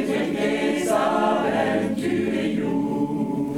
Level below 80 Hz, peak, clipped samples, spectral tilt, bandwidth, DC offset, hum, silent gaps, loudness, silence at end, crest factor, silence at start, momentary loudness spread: -56 dBFS; -8 dBFS; under 0.1%; -5.5 dB/octave; 16 kHz; 0.1%; none; none; -23 LUFS; 0 s; 14 dB; 0 s; 4 LU